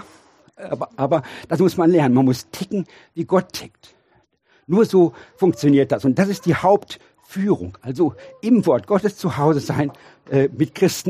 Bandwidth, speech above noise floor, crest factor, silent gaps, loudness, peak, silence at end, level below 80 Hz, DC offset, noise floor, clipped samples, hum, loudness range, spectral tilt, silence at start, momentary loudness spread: 15.5 kHz; 42 dB; 18 dB; none; -19 LUFS; -2 dBFS; 0 s; -58 dBFS; under 0.1%; -61 dBFS; under 0.1%; none; 2 LU; -7 dB/octave; 0.6 s; 13 LU